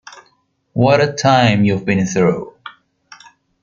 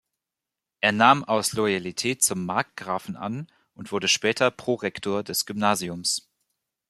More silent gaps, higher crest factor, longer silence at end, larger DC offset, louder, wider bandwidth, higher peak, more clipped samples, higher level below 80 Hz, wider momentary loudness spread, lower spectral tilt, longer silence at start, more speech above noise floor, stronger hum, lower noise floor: neither; second, 16 dB vs 24 dB; first, 0.95 s vs 0.7 s; neither; first, -15 LUFS vs -24 LUFS; second, 7.6 kHz vs 15 kHz; about the same, -2 dBFS vs -2 dBFS; neither; first, -52 dBFS vs -66 dBFS; about the same, 13 LU vs 14 LU; first, -6 dB/octave vs -3 dB/octave; second, 0.15 s vs 0.8 s; second, 47 dB vs 63 dB; neither; second, -60 dBFS vs -87 dBFS